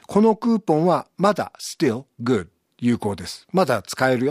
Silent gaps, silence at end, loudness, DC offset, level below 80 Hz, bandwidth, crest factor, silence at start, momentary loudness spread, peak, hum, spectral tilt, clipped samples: none; 0 s; -22 LUFS; under 0.1%; -58 dBFS; 15.5 kHz; 18 dB; 0.1 s; 8 LU; -4 dBFS; none; -6 dB/octave; under 0.1%